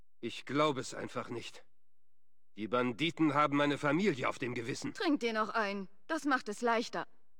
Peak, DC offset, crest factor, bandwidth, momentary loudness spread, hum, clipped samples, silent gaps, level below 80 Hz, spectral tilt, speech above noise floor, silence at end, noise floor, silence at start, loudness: -16 dBFS; 0.3%; 18 dB; 16.5 kHz; 13 LU; none; under 0.1%; none; -74 dBFS; -5 dB/octave; 54 dB; 0.35 s; -88 dBFS; 0.25 s; -34 LUFS